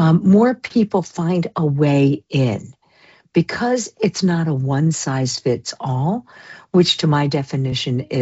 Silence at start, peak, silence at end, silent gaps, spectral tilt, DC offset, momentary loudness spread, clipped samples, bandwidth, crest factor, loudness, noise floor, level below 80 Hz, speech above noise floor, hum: 0 s; -2 dBFS; 0 s; none; -6 dB/octave; under 0.1%; 7 LU; under 0.1%; 8.2 kHz; 14 dB; -18 LUFS; -52 dBFS; -56 dBFS; 34 dB; none